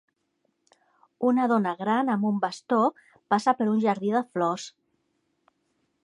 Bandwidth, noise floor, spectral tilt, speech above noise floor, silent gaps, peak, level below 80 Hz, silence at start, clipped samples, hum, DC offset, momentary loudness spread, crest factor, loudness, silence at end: 10.5 kHz; -75 dBFS; -6.5 dB/octave; 50 dB; none; -8 dBFS; -80 dBFS; 1.2 s; under 0.1%; none; under 0.1%; 5 LU; 18 dB; -25 LUFS; 1.35 s